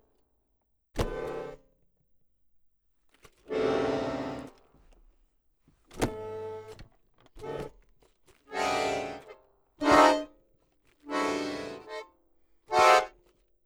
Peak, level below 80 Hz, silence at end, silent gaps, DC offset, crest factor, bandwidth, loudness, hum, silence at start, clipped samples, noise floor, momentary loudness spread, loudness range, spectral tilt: -8 dBFS; -52 dBFS; 0.55 s; none; under 0.1%; 24 dB; over 20 kHz; -28 LUFS; none; 0.95 s; under 0.1%; -74 dBFS; 23 LU; 12 LU; -4 dB/octave